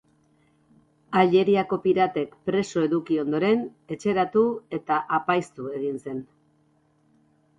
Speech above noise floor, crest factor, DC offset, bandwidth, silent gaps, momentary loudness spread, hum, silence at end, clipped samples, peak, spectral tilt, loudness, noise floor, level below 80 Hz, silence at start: 41 dB; 18 dB; under 0.1%; 10.5 kHz; none; 12 LU; none; 1.35 s; under 0.1%; -6 dBFS; -6.5 dB/octave; -24 LUFS; -64 dBFS; -66 dBFS; 1.1 s